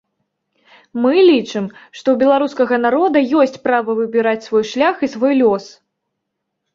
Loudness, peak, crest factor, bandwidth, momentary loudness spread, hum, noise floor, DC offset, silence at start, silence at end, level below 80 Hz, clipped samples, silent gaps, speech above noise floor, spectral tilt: -15 LUFS; -2 dBFS; 14 dB; 7.6 kHz; 10 LU; none; -76 dBFS; under 0.1%; 0.95 s; 1.05 s; -62 dBFS; under 0.1%; none; 61 dB; -5.5 dB/octave